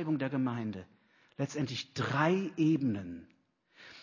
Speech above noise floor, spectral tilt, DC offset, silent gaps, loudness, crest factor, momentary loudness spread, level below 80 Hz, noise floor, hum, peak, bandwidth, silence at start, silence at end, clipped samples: 31 dB; -6.5 dB/octave; under 0.1%; none; -33 LUFS; 20 dB; 18 LU; -68 dBFS; -63 dBFS; none; -14 dBFS; 7.4 kHz; 0 s; 0 s; under 0.1%